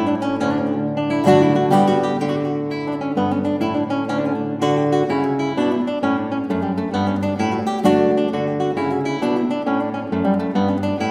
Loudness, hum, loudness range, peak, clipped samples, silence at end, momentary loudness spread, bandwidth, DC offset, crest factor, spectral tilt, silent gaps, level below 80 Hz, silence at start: -20 LUFS; none; 2 LU; 0 dBFS; under 0.1%; 0 s; 7 LU; 12.5 kHz; under 0.1%; 18 dB; -7 dB/octave; none; -58 dBFS; 0 s